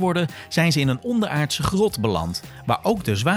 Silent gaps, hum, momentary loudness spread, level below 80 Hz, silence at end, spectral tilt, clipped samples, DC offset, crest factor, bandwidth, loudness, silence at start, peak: none; none; 6 LU; -44 dBFS; 0 s; -5.5 dB/octave; under 0.1%; under 0.1%; 18 dB; over 20 kHz; -22 LUFS; 0 s; -4 dBFS